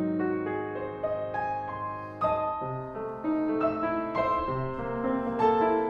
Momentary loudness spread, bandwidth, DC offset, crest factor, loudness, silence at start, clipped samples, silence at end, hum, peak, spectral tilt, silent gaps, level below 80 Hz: 9 LU; 6.8 kHz; under 0.1%; 18 dB; -30 LUFS; 0 s; under 0.1%; 0 s; none; -12 dBFS; -9 dB/octave; none; -54 dBFS